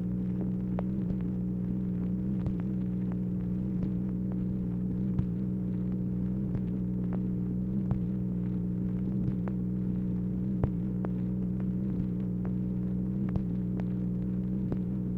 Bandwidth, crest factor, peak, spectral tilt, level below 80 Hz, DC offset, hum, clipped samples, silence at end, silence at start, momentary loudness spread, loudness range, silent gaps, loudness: 3 kHz; 20 dB; -12 dBFS; -12 dB/octave; -44 dBFS; under 0.1%; 60 Hz at -45 dBFS; under 0.1%; 0 s; 0 s; 1 LU; 0 LU; none; -32 LUFS